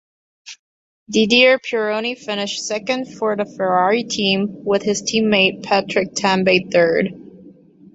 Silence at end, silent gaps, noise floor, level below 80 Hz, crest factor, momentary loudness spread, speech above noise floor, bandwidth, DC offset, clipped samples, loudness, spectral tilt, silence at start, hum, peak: 0.45 s; 0.59-1.06 s; -45 dBFS; -60 dBFS; 18 dB; 9 LU; 27 dB; 8 kHz; under 0.1%; under 0.1%; -17 LUFS; -3.5 dB/octave; 0.45 s; none; -2 dBFS